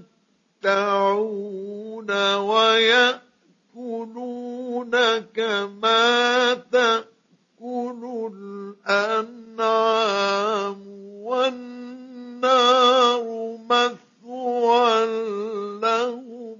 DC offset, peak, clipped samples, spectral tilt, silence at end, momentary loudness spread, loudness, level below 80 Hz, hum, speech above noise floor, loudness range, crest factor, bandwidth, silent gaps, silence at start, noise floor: under 0.1%; -4 dBFS; under 0.1%; -2.5 dB/octave; 0.05 s; 19 LU; -21 LUFS; -82 dBFS; none; 45 dB; 4 LU; 20 dB; 7.4 kHz; none; 0.65 s; -65 dBFS